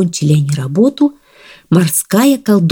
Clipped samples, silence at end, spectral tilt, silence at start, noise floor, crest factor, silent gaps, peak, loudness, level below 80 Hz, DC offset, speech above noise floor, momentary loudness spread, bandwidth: under 0.1%; 0 s; -6 dB/octave; 0 s; -42 dBFS; 12 dB; none; 0 dBFS; -13 LUFS; -54 dBFS; under 0.1%; 30 dB; 5 LU; 19 kHz